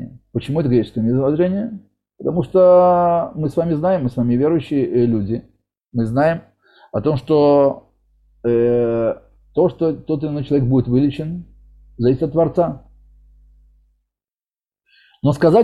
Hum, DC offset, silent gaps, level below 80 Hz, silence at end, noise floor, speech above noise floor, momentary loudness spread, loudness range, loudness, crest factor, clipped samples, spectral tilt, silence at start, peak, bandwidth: none; under 0.1%; none; -46 dBFS; 0 s; under -90 dBFS; over 74 dB; 14 LU; 7 LU; -18 LUFS; 16 dB; under 0.1%; -9.5 dB/octave; 0 s; -2 dBFS; 11 kHz